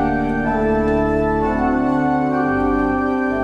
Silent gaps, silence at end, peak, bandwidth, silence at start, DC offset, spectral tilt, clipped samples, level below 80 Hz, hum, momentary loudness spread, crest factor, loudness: none; 0 s; -6 dBFS; 7.8 kHz; 0 s; under 0.1%; -8.5 dB/octave; under 0.1%; -32 dBFS; none; 2 LU; 12 dB; -18 LUFS